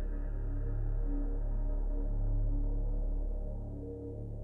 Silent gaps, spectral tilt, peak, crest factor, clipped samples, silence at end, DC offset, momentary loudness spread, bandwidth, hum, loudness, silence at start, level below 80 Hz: none; -11.5 dB/octave; -24 dBFS; 8 dB; under 0.1%; 0 s; under 0.1%; 6 LU; 1.8 kHz; none; -39 LUFS; 0 s; -34 dBFS